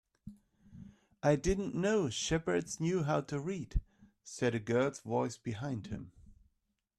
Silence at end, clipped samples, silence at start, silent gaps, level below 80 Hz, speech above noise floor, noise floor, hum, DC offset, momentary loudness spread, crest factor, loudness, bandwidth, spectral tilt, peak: 0.65 s; under 0.1%; 0.25 s; none; -48 dBFS; 47 dB; -81 dBFS; none; under 0.1%; 23 LU; 18 dB; -35 LUFS; 12.5 kHz; -5.5 dB/octave; -18 dBFS